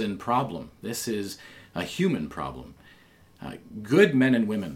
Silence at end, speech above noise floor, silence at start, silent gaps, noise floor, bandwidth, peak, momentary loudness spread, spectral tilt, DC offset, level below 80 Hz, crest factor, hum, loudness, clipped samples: 0 s; 29 dB; 0 s; none; -56 dBFS; 16.5 kHz; -6 dBFS; 21 LU; -5.5 dB/octave; under 0.1%; -56 dBFS; 20 dB; none; -26 LUFS; under 0.1%